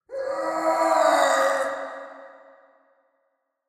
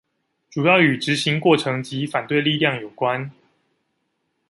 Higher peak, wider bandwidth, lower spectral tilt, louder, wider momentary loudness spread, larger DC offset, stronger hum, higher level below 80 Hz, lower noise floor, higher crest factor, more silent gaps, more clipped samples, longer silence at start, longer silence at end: second, -6 dBFS vs -2 dBFS; first, 15.5 kHz vs 11.5 kHz; second, -1.5 dB/octave vs -5.5 dB/octave; about the same, -22 LUFS vs -20 LUFS; first, 17 LU vs 10 LU; neither; neither; second, -76 dBFS vs -66 dBFS; about the same, -74 dBFS vs -72 dBFS; about the same, 18 dB vs 20 dB; neither; neither; second, 0.1 s vs 0.55 s; first, 1.35 s vs 1.2 s